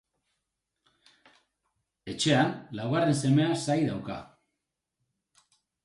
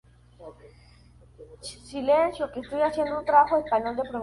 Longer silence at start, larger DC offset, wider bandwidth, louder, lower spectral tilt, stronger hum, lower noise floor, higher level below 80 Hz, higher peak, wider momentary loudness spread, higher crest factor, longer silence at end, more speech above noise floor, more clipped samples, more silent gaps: first, 2.05 s vs 0.4 s; neither; about the same, 11.5 kHz vs 11.5 kHz; second, -27 LUFS vs -24 LUFS; about the same, -5.5 dB/octave vs -5 dB/octave; second, none vs 60 Hz at -50 dBFS; first, -85 dBFS vs -54 dBFS; second, -66 dBFS vs -56 dBFS; second, -10 dBFS vs -6 dBFS; about the same, 16 LU vs 18 LU; about the same, 20 dB vs 20 dB; first, 1.6 s vs 0 s; first, 58 dB vs 29 dB; neither; neither